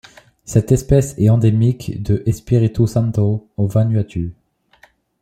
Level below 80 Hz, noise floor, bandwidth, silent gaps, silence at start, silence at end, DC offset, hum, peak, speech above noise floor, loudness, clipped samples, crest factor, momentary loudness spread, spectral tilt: -38 dBFS; -53 dBFS; 13.5 kHz; none; 0.5 s; 0.9 s; under 0.1%; none; -2 dBFS; 37 dB; -17 LUFS; under 0.1%; 14 dB; 7 LU; -8 dB/octave